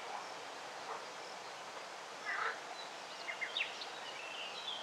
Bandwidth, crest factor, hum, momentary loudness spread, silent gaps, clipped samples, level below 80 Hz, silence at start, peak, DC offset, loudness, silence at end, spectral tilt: 16 kHz; 18 dB; none; 8 LU; none; under 0.1%; under -90 dBFS; 0 s; -26 dBFS; under 0.1%; -43 LUFS; 0 s; -0.5 dB/octave